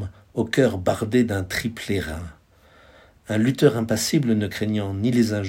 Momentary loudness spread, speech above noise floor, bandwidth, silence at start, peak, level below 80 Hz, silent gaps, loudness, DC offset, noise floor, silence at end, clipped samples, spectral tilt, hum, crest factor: 9 LU; 32 dB; 16.5 kHz; 0 s; -2 dBFS; -50 dBFS; none; -22 LUFS; under 0.1%; -53 dBFS; 0 s; under 0.1%; -5.5 dB/octave; none; 20 dB